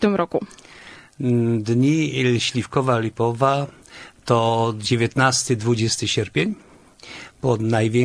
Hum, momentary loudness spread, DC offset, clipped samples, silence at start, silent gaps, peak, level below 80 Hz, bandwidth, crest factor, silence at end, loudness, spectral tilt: none; 19 LU; under 0.1%; under 0.1%; 0 s; none; -2 dBFS; -54 dBFS; 11 kHz; 18 dB; 0 s; -20 LUFS; -5 dB/octave